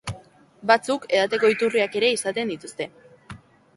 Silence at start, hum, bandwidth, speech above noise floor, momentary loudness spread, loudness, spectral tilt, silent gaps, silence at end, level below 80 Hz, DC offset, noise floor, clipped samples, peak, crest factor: 0.05 s; none; 11.5 kHz; 27 dB; 14 LU; -22 LUFS; -3.5 dB/octave; none; 0.4 s; -58 dBFS; under 0.1%; -49 dBFS; under 0.1%; -4 dBFS; 20 dB